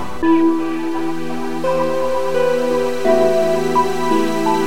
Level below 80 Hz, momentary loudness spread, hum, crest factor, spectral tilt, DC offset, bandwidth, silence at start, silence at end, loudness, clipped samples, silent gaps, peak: -48 dBFS; 8 LU; none; 14 dB; -5.5 dB/octave; 7%; 16.5 kHz; 0 s; 0 s; -17 LUFS; under 0.1%; none; -2 dBFS